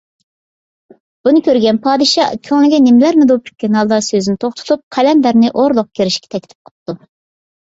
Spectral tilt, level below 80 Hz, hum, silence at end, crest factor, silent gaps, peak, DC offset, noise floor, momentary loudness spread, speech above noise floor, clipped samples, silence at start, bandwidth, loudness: -5 dB/octave; -56 dBFS; none; 0.75 s; 12 dB; 4.83-4.91 s, 6.55-6.65 s, 6.71-6.86 s; -2 dBFS; under 0.1%; under -90 dBFS; 17 LU; over 78 dB; under 0.1%; 1.25 s; 8 kHz; -12 LUFS